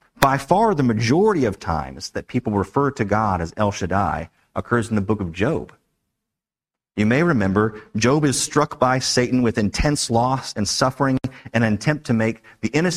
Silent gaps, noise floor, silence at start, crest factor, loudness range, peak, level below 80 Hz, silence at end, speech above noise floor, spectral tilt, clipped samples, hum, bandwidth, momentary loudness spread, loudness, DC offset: none; -89 dBFS; 0.2 s; 20 dB; 4 LU; 0 dBFS; -40 dBFS; 0 s; 69 dB; -5 dB/octave; under 0.1%; none; 16 kHz; 8 LU; -20 LUFS; under 0.1%